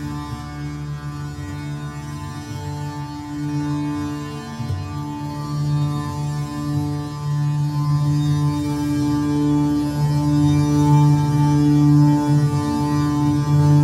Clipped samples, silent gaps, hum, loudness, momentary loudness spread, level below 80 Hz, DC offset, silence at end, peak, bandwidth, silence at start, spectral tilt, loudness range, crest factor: under 0.1%; none; none; -20 LUFS; 14 LU; -40 dBFS; under 0.1%; 0 s; -6 dBFS; 13 kHz; 0 s; -7.5 dB/octave; 11 LU; 14 dB